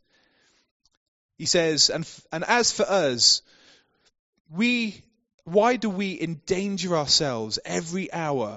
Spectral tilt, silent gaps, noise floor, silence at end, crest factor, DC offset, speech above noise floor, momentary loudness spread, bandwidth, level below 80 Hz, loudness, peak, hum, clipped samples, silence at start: -2.5 dB/octave; 4.19-4.33 s, 4.40-4.45 s, 5.34-5.38 s; -65 dBFS; 0 s; 20 dB; under 0.1%; 41 dB; 12 LU; 8 kHz; -60 dBFS; -23 LUFS; -6 dBFS; none; under 0.1%; 1.4 s